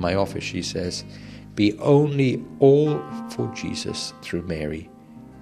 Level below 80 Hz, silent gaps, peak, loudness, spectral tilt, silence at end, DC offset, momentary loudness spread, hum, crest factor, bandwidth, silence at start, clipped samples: -50 dBFS; none; -4 dBFS; -23 LUFS; -6 dB/octave; 0 s; under 0.1%; 15 LU; none; 18 dB; 13 kHz; 0 s; under 0.1%